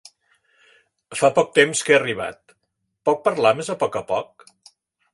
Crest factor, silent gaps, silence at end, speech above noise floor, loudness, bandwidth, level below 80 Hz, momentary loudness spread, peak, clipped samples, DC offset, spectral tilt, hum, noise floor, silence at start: 22 dB; none; 0.9 s; 55 dB; -20 LUFS; 11.5 kHz; -64 dBFS; 12 LU; -2 dBFS; under 0.1%; under 0.1%; -3.5 dB/octave; none; -75 dBFS; 1.1 s